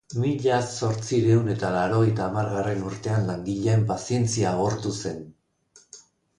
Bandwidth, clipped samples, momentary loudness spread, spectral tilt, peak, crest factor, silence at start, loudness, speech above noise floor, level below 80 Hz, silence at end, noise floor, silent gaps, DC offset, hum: 11 kHz; under 0.1%; 7 LU; -6.5 dB/octave; -10 dBFS; 16 dB; 0.1 s; -25 LUFS; 35 dB; -52 dBFS; 0.4 s; -58 dBFS; none; under 0.1%; none